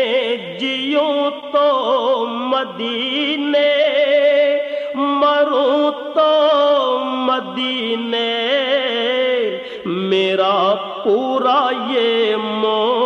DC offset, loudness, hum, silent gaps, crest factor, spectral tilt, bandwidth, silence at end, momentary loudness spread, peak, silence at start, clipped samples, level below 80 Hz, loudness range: under 0.1%; -17 LUFS; none; none; 12 dB; -5 dB/octave; 7 kHz; 0 s; 6 LU; -4 dBFS; 0 s; under 0.1%; -66 dBFS; 3 LU